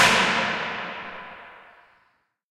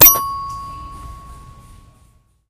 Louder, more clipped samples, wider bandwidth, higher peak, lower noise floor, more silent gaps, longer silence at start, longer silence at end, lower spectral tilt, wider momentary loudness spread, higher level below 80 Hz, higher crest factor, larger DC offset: second, -23 LUFS vs -14 LUFS; second, under 0.1% vs 0.3%; about the same, 16 kHz vs 15.5 kHz; second, -4 dBFS vs 0 dBFS; first, -67 dBFS vs -54 dBFS; neither; about the same, 0 s vs 0 s; second, 0.9 s vs 1.15 s; about the same, -2 dB/octave vs -1 dB/octave; about the same, 24 LU vs 24 LU; second, -60 dBFS vs -40 dBFS; about the same, 22 dB vs 18 dB; neither